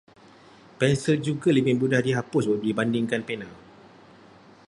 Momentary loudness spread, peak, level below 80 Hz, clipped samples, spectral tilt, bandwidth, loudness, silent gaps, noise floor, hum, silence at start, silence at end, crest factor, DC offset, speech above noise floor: 8 LU; -6 dBFS; -62 dBFS; under 0.1%; -6.5 dB/octave; 11.5 kHz; -24 LUFS; none; -51 dBFS; none; 0.8 s; 1.1 s; 20 dB; under 0.1%; 28 dB